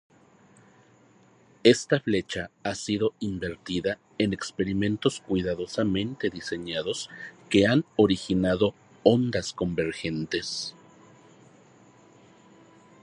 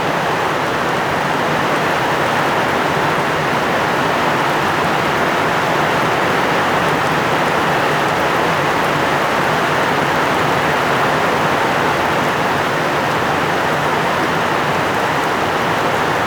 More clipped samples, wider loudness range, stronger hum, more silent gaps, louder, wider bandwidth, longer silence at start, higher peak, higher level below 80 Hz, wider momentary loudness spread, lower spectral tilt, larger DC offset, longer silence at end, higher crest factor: neither; first, 4 LU vs 1 LU; neither; neither; second, -27 LUFS vs -15 LUFS; second, 11 kHz vs over 20 kHz; first, 1.65 s vs 0 s; about the same, -4 dBFS vs -4 dBFS; second, -54 dBFS vs -46 dBFS; first, 11 LU vs 1 LU; about the same, -5.5 dB/octave vs -4.5 dB/octave; neither; first, 2.35 s vs 0 s; first, 24 dB vs 12 dB